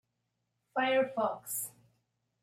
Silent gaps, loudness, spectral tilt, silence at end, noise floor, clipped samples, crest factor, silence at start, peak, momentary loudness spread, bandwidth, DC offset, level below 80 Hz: none; -33 LUFS; -2.5 dB/octave; 0.7 s; -83 dBFS; under 0.1%; 16 dB; 0.75 s; -18 dBFS; 9 LU; 16 kHz; under 0.1%; -84 dBFS